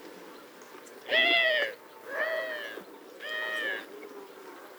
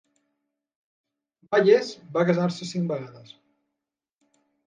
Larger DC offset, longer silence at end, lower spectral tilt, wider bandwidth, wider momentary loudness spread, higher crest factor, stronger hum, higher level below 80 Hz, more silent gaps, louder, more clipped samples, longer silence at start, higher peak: neither; second, 0 s vs 1.5 s; second, -1 dB/octave vs -6.5 dB/octave; first, over 20 kHz vs 9.4 kHz; first, 25 LU vs 12 LU; about the same, 20 dB vs 22 dB; neither; second, -86 dBFS vs -78 dBFS; neither; second, -28 LUFS vs -24 LUFS; neither; second, 0 s vs 1.5 s; second, -12 dBFS vs -6 dBFS